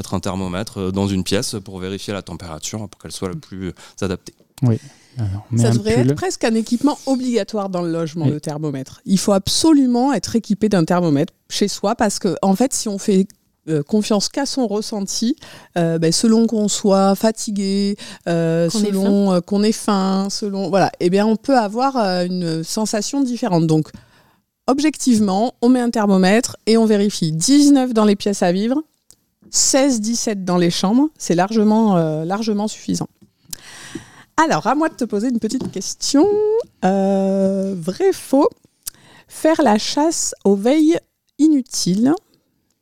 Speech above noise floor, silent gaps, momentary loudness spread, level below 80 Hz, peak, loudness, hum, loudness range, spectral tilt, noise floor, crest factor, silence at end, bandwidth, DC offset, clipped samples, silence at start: 45 dB; none; 12 LU; -52 dBFS; -2 dBFS; -18 LUFS; none; 5 LU; -5 dB/octave; -62 dBFS; 16 dB; 0.65 s; 16 kHz; 0.6%; under 0.1%; 0 s